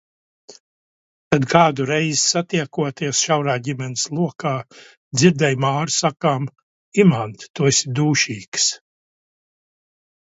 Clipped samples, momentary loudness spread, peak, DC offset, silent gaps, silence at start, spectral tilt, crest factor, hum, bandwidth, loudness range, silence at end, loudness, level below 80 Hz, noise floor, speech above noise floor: under 0.1%; 10 LU; 0 dBFS; under 0.1%; 0.60-1.31 s, 4.97-5.11 s, 6.63-6.92 s, 7.50-7.54 s, 8.48-8.52 s; 0.5 s; -4 dB/octave; 20 dB; none; 8 kHz; 2 LU; 1.5 s; -19 LUFS; -60 dBFS; under -90 dBFS; over 71 dB